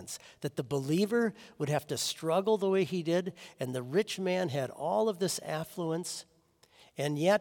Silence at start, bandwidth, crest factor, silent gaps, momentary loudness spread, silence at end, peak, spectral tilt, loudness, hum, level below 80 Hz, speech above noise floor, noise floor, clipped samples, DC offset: 0 s; 18 kHz; 18 dB; none; 11 LU; 0 s; -14 dBFS; -5 dB/octave; -32 LUFS; none; -74 dBFS; 33 dB; -65 dBFS; under 0.1%; under 0.1%